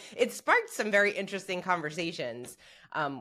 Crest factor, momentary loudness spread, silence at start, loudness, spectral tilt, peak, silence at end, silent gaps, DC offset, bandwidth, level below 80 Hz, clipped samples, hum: 20 dB; 13 LU; 0 s; -30 LUFS; -3.5 dB/octave; -10 dBFS; 0 s; none; under 0.1%; 16 kHz; -76 dBFS; under 0.1%; none